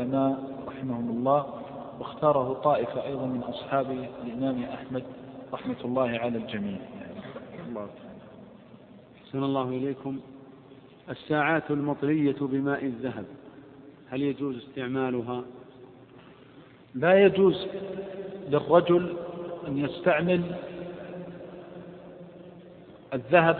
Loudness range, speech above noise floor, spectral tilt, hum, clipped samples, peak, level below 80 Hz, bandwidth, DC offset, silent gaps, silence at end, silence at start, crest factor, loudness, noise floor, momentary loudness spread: 10 LU; 25 dB; -11 dB/octave; none; under 0.1%; -4 dBFS; -64 dBFS; 4.6 kHz; under 0.1%; none; 0 s; 0 s; 24 dB; -28 LUFS; -52 dBFS; 21 LU